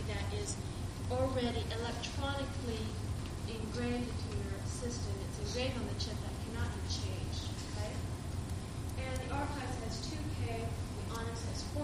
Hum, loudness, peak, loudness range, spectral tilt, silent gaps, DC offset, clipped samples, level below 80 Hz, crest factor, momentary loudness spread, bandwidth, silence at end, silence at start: none; -39 LUFS; -20 dBFS; 2 LU; -5 dB/octave; none; under 0.1%; under 0.1%; -46 dBFS; 18 dB; 4 LU; 15 kHz; 0 s; 0 s